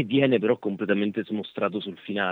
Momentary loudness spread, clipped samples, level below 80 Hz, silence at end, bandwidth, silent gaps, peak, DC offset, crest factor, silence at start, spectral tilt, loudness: 10 LU; under 0.1%; -76 dBFS; 0 s; 4.4 kHz; none; -8 dBFS; under 0.1%; 18 dB; 0 s; -8.5 dB/octave; -26 LUFS